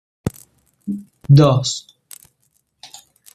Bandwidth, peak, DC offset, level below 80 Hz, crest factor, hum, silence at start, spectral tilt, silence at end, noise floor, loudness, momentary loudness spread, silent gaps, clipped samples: 13.5 kHz; -2 dBFS; under 0.1%; -50 dBFS; 18 dB; none; 0.25 s; -6.5 dB/octave; 1.55 s; -65 dBFS; -17 LUFS; 28 LU; none; under 0.1%